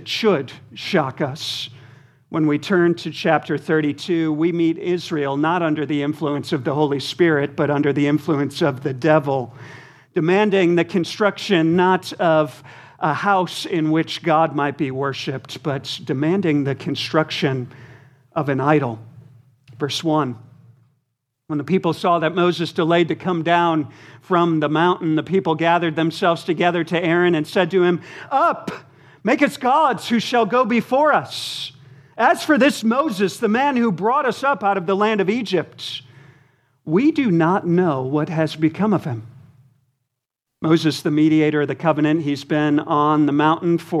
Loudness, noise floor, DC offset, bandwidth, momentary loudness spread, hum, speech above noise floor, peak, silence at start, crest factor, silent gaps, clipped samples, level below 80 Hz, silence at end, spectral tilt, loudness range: -19 LUFS; -80 dBFS; under 0.1%; 14 kHz; 9 LU; none; 62 dB; -2 dBFS; 0 s; 18 dB; none; under 0.1%; -68 dBFS; 0 s; -6 dB/octave; 4 LU